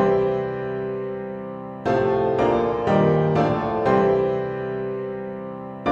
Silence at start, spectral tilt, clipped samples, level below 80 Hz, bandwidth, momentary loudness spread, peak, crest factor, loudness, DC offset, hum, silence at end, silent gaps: 0 s; -8.5 dB/octave; under 0.1%; -48 dBFS; 7.4 kHz; 13 LU; -6 dBFS; 16 dB; -22 LUFS; under 0.1%; none; 0 s; none